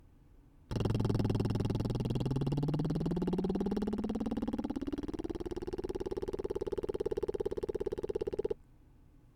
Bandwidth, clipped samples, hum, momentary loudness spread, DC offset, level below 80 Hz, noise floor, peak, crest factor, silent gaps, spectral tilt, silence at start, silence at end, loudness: 15 kHz; under 0.1%; none; 7 LU; under 0.1%; -48 dBFS; -60 dBFS; -18 dBFS; 16 dB; none; -8.5 dB/octave; 0.35 s; 0.1 s; -36 LUFS